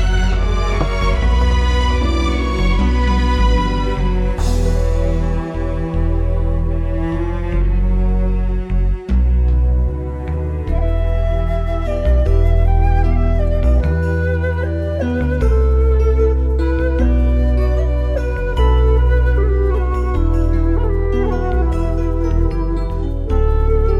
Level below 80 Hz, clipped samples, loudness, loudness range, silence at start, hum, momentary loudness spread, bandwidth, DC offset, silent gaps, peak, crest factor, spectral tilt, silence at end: -16 dBFS; under 0.1%; -18 LUFS; 3 LU; 0 s; none; 5 LU; 7.6 kHz; under 0.1%; none; -4 dBFS; 10 dB; -7.5 dB/octave; 0 s